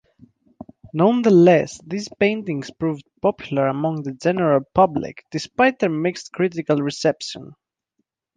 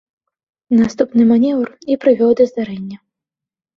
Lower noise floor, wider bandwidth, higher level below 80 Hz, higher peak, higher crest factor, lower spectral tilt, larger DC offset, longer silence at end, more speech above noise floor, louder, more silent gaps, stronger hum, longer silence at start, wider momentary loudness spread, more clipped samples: second, -74 dBFS vs -85 dBFS; first, 9.6 kHz vs 6.8 kHz; about the same, -56 dBFS vs -56 dBFS; about the same, -2 dBFS vs -2 dBFS; about the same, 18 dB vs 14 dB; about the same, -6.5 dB/octave vs -7.5 dB/octave; neither; about the same, 0.85 s vs 0.8 s; second, 55 dB vs 72 dB; second, -20 LUFS vs -15 LUFS; neither; neither; first, 0.85 s vs 0.7 s; first, 15 LU vs 12 LU; neither